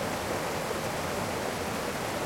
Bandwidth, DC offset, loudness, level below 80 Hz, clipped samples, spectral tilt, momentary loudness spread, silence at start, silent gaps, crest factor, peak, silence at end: 16.5 kHz; under 0.1%; -32 LUFS; -54 dBFS; under 0.1%; -4 dB/octave; 1 LU; 0 s; none; 12 dB; -20 dBFS; 0 s